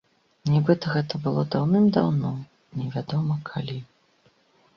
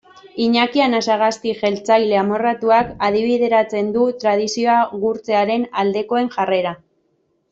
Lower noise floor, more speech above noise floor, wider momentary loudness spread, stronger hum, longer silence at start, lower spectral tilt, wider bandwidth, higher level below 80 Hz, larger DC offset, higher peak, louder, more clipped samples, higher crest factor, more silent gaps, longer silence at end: about the same, -63 dBFS vs -65 dBFS; second, 39 dB vs 48 dB; first, 14 LU vs 5 LU; neither; first, 0.45 s vs 0.25 s; first, -8.5 dB/octave vs -4.5 dB/octave; second, 6.6 kHz vs 8 kHz; about the same, -60 dBFS vs -56 dBFS; neither; about the same, -6 dBFS vs -4 dBFS; second, -25 LUFS vs -18 LUFS; neither; about the same, 18 dB vs 14 dB; neither; first, 0.9 s vs 0.75 s